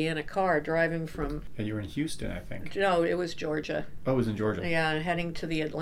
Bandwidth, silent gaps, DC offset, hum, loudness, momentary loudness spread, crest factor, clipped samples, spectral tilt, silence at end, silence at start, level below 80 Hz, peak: 15.5 kHz; none; under 0.1%; none; -30 LUFS; 9 LU; 16 dB; under 0.1%; -6 dB/octave; 0 s; 0 s; -46 dBFS; -14 dBFS